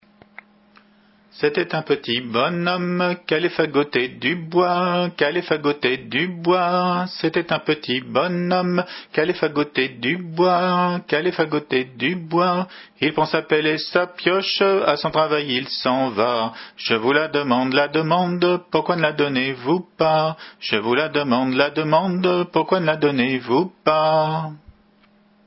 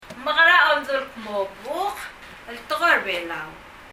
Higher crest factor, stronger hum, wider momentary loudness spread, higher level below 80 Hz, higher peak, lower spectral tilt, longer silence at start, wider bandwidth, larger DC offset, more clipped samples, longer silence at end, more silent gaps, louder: about the same, 20 dB vs 20 dB; neither; second, 5 LU vs 23 LU; second, -62 dBFS vs -56 dBFS; first, 0 dBFS vs -4 dBFS; first, -9.5 dB/octave vs -2 dB/octave; first, 1.35 s vs 0 s; second, 5.8 kHz vs 16 kHz; neither; neither; first, 0.9 s vs 0 s; neither; about the same, -20 LUFS vs -20 LUFS